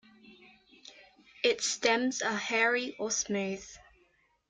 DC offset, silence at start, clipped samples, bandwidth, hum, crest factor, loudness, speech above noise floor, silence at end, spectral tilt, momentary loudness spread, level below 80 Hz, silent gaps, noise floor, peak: under 0.1%; 0.25 s; under 0.1%; 9.6 kHz; none; 20 dB; -30 LUFS; 39 dB; 0.7 s; -2 dB/octave; 12 LU; -70 dBFS; none; -70 dBFS; -12 dBFS